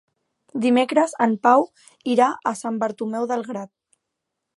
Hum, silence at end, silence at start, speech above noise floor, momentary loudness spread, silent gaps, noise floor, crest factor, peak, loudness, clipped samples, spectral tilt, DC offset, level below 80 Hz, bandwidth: none; 0.9 s; 0.55 s; 60 dB; 15 LU; none; -81 dBFS; 18 dB; -4 dBFS; -21 LUFS; under 0.1%; -5 dB/octave; under 0.1%; -76 dBFS; 11.5 kHz